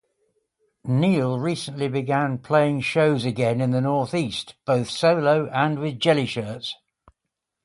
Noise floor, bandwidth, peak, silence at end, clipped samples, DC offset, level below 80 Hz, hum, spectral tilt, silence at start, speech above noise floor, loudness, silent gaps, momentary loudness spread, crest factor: -83 dBFS; 11.5 kHz; -4 dBFS; 0.9 s; under 0.1%; under 0.1%; -60 dBFS; none; -6.5 dB/octave; 0.85 s; 61 dB; -22 LUFS; none; 9 LU; 18 dB